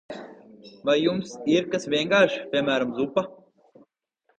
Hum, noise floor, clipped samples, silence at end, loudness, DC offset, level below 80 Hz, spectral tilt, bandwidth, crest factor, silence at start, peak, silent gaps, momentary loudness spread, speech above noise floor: none; -71 dBFS; under 0.1%; 1.05 s; -24 LUFS; under 0.1%; -66 dBFS; -5 dB/octave; 8.8 kHz; 22 dB; 0.1 s; -4 dBFS; none; 12 LU; 47 dB